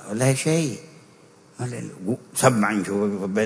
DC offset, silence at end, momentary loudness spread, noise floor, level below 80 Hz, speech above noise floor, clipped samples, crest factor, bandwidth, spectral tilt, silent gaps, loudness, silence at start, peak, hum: under 0.1%; 0 s; 13 LU; -52 dBFS; -64 dBFS; 29 dB; under 0.1%; 22 dB; 11 kHz; -5 dB/octave; none; -23 LUFS; 0 s; -2 dBFS; none